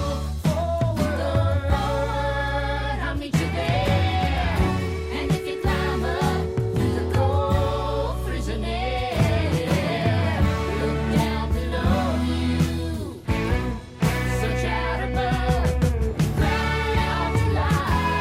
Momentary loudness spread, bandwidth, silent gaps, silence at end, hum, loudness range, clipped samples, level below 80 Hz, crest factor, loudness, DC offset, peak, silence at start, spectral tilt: 5 LU; 16 kHz; none; 0 s; none; 1 LU; under 0.1%; -30 dBFS; 16 dB; -24 LUFS; under 0.1%; -8 dBFS; 0 s; -6.5 dB/octave